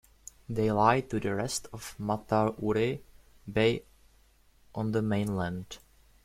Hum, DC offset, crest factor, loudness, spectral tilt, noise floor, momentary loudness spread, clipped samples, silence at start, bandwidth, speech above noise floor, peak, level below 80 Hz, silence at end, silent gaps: none; under 0.1%; 22 dB; -30 LUFS; -5.5 dB/octave; -62 dBFS; 18 LU; under 0.1%; 0.5 s; 15.5 kHz; 33 dB; -10 dBFS; -56 dBFS; 0.45 s; none